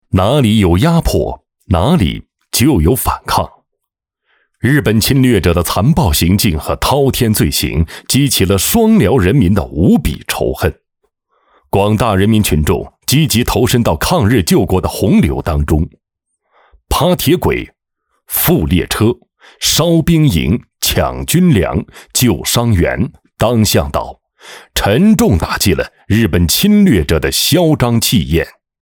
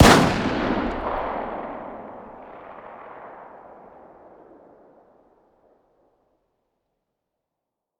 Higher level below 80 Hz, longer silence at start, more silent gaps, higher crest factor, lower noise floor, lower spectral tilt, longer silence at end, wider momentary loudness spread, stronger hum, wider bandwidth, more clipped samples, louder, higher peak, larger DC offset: first, -28 dBFS vs -40 dBFS; first, 0.15 s vs 0 s; neither; second, 12 dB vs 26 dB; second, -76 dBFS vs -84 dBFS; about the same, -5 dB/octave vs -5 dB/octave; second, 0.3 s vs 4.3 s; second, 8 LU vs 23 LU; neither; about the same, over 20 kHz vs over 20 kHz; neither; first, -12 LUFS vs -23 LUFS; about the same, -2 dBFS vs 0 dBFS; neither